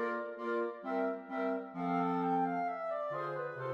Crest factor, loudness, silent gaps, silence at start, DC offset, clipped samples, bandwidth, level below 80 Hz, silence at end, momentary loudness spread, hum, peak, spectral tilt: 14 dB; -36 LUFS; none; 0 s; under 0.1%; under 0.1%; 6.8 kHz; -86 dBFS; 0 s; 5 LU; none; -22 dBFS; -8.5 dB/octave